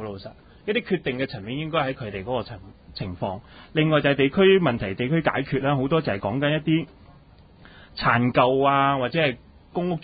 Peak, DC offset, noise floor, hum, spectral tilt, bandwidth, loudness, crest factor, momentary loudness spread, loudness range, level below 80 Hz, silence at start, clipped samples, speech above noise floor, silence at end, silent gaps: -4 dBFS; under 0.1%; -51 dBFS; none; -11 dB/octave; 5 kHz; -23 LUFS; 20 dB; 17 LU; 7 LU; -50 dBFS; 0 s; under 0.1%; 28 dB; 0 s; none